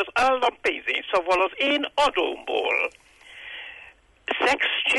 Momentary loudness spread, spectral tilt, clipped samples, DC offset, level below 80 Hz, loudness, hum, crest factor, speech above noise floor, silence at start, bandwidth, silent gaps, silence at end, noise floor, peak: 16 LU; -2 dB/octave; under 0.1%; under 0.1%; -56 dBFS; -23 LUFS; none; 14 dB; 27 dB; 0 s; 11.5 kHz; none; 0 s; -50 dBFS; -10 dBFS